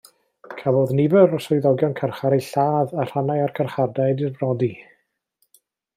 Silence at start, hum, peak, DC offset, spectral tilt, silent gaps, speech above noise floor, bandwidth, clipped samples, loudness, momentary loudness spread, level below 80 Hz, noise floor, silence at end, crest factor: 0.5 s; none; -2 dBFS; under 0.1%; -8 dB/octave; none; 50 dB; 15.5 kHz; under 0.1%; -21 LUFS; 7 LU; -64 dBFS; -70 dBFS; 1.15 s; 18 dB